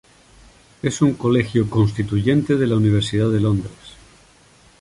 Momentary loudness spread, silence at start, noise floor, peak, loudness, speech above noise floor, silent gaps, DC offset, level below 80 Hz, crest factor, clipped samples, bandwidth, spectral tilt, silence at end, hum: 7 LU; 0.85 s; -51 dBFS; -4 dBFS; -19 LUFS; 33 dB; none; under 0.1%; -44 dBFS; 16 dB; under 0.1%; 11.5 kHz; -7 dB/octave; 0.9 s; none